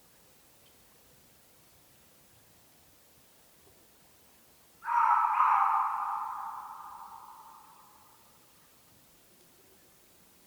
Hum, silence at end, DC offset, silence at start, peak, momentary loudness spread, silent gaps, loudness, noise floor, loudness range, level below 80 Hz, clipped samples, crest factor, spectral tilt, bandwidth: none; 2.85 s; under 0.1%; 4.8 s; -12 dBFS; 26 LU; none; -29 LUFS; -61 dBFS; 20 LU; -78 dBFS; under 0.1%; 24 dB; -1.5 dB/octave; over 20 kHz